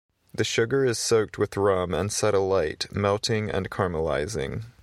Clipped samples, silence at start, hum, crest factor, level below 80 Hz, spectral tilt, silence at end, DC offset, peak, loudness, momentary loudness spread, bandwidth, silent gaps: under 0.1%; 0.35 s; none; 18 dB; -48 dBFS; -4.5 dB/octave; 0.15 s; under 0.1%; -8 dBFS; -25 LUFS; 6 LU; 15 kHz; none